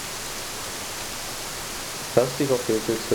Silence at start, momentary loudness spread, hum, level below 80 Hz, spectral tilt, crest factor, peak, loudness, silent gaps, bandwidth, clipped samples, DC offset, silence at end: 0 s; 7 LU; none; -48 dBFS; -3.5 dB/octave; 22 dB; -6 dBFS; -27 LUFS; none; over 20 kHz; under 0.1%; under 0.1%; 0 s